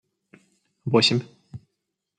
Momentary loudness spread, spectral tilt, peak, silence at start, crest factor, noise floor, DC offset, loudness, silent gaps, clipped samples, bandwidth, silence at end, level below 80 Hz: 26 LU; -4.5 dB/octave; -6 dBFS; 0.85 s; 22 dB; -80 dBFS; under 0.1%; -21 LUFS; none; under 0.1%; 10 kHz; 0.6 s; -68 dBFS